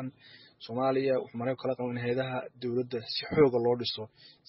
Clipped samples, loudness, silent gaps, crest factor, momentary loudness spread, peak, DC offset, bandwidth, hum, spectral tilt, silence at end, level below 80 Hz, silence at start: under 0.1%; -30 LUFS; none; 18 dB; 14 LU; -12 dBFS; under 0.1%; 5.8 kHz; none; -4.5 dB/octave; 0.15 s; -66 dBFS; 0 s